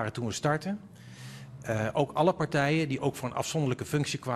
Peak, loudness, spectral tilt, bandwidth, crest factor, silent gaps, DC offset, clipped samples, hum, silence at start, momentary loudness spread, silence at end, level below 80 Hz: -10 dBFS; -30 LUFS; -5.5 dB/octave; 13.5 kHz; 20 dB; none; under 0.1%; under 0.1%; none; 0 s; 18 LU; 0 s; -60 dBFS